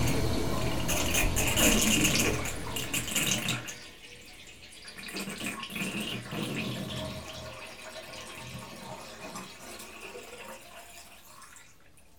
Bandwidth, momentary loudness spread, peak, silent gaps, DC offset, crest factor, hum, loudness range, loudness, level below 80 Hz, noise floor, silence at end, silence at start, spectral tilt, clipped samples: over 20 kHz; 23 LU; -10 dBFS; none; under 0.1%; 24 dB; none; 16 LU; -30 LUFS; -44 dBFS; -59 dBFS; 0 s; 0 s; -3 dB/octave; under 0.1%